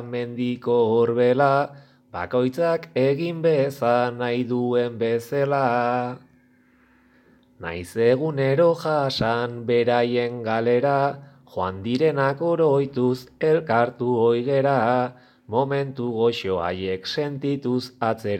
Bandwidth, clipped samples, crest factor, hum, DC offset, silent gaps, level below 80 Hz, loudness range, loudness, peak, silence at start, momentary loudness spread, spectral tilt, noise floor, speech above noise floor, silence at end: 15.5 kHz; under 0.1%; 18 dB; none; under 0.1%; none; -60 dBFS; 4 LU; -22 LUFS; -4 dBFS; 0 s; 8 LU; -7 dB/octave; -58 dBFS; 36 dB; 0 s